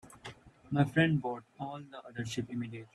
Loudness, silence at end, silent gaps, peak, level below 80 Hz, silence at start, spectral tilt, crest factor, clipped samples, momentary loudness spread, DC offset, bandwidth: -34 LUFS; 0.1 s; none; -14 dBFS; -66 dBFS; 0.05 s; -6.5 dB/octave; 20 dB; under 0.1%; 20 LU; under 0.1%; 12 kHz